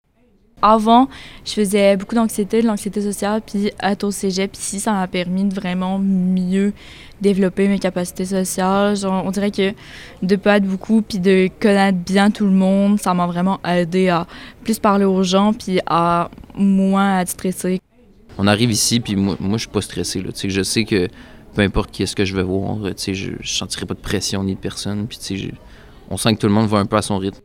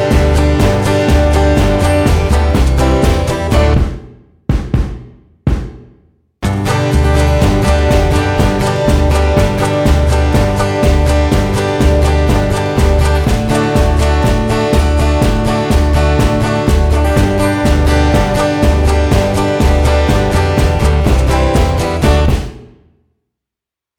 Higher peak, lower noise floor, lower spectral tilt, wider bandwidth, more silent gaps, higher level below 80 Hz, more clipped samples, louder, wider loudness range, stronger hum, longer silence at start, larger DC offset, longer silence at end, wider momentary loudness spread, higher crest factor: about the same, 0 dBFS vs 0 dBFS; second, -56 dBFS vs -85 dBFS; second, -5 dB/octave vs -6.5 dB/octave; about the same, 16 kHz vs 15 kHz; neither; second, -42 dBFS vs -14 dBFS; neither; second, -18 LUFS vs -12 LUFS; about the same, 5 LU vs 3 LU; neither; first, 0.6 s vs 0 s; neither; second, 0.1 s vs 1.35 s; first, 9 LU vs 4 LU; first, 18 dB vs 10 dB